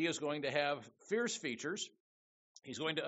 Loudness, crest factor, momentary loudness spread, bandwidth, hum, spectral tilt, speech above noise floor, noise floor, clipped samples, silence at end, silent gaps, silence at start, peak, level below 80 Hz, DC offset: -39 LUFS; 20 dB; 10 LU; 8 kHz; none; -2.5 dB/octave; over 51 dB; under -90 dBFS; under 0.1%; 0 s; 2.00-2.55 s; 0 s; -20 dBFS; -82 dBFS; under 0.1%